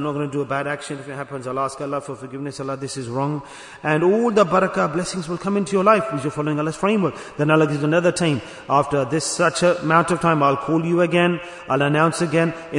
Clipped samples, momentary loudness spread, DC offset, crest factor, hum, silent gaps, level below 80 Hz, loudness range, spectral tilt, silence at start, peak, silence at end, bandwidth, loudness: under 0.1%; 11 LU; under 0.1%; 18 dB; none; none; -56 dBFS; 8 LU; -5.5 dB/octave; 0 s; -2 dBFS; 0 s; 11 kHz; -20 LUFS